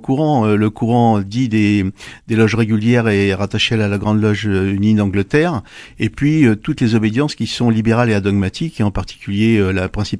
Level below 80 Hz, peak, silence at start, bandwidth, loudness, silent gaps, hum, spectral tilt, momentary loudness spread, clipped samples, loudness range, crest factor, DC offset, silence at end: -40 dBFS; 0 dBFS; 0 s; 11 kHz; -16 LUFS; none; none; -7 dB/octave; 6 LU; under 0.1%; 1 LU; 16 dB; under 0.1%; 0 s